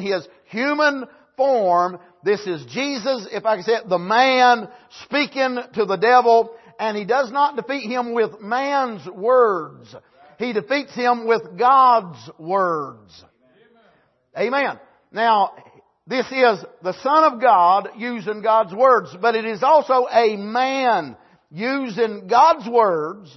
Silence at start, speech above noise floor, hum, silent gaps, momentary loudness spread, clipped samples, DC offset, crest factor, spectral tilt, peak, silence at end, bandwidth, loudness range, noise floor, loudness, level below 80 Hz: 0 s; 40 dB; none; none; 12 LU; under 0.1%; under 0.1%; 16 dB; -4.5 dB/octave; -4 dBFS; 0.1 s; 6.2 kHz; 4 LU; -59 dBFS; -19 LUFS; -74 dBFS